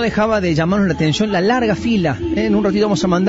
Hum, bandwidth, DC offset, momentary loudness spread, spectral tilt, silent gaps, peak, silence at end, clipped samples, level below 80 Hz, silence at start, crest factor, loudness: none; 8 kHz; under 0.1%; 2 LU; -6 dB/octave; none; -4 dBFS; 0 s; under 0.1%; -38 dBFS; 0 s; 12 dB; -16 LUFS